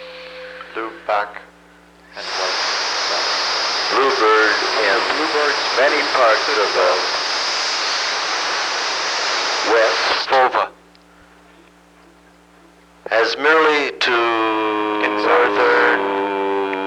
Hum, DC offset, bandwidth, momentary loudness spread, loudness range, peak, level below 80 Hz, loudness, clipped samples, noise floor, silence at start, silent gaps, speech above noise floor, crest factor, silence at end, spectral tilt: 60 Hz at -75 dBFS; under 0.1%; 12 kHz; 8 LU; 6 LU; -2 dBFS; -60 dBFS; -17 LUFS; under 0.1%; -49 dBFS; 0 s; none; 32 dB; 16 dB; 0 s; -1 dB/octave